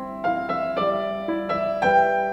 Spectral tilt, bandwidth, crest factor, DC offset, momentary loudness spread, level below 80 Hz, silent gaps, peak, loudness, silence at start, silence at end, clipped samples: -6.5 dB/octave; 8.2 kHz; 16 dB; under 0.1%; 7 LU; -54 dBFS; none; -8 dBFS; -23 LUFS; 0 s; 0 s; under 0.1%